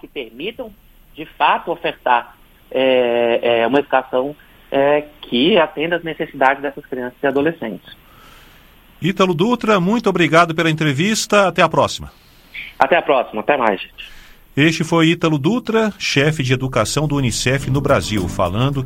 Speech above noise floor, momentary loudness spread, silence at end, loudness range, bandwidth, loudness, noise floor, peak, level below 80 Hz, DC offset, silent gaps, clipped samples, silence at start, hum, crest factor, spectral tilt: 30 dB; 13 LU; 0 s; 4 LU; 16.5 kHz; -17 LUFS; -46 dBFS; 0 dBFS; -42 dBFS; under 0.1%; none; under 0.1%; 0.05 s; none; 18 dB; -5 dB/octave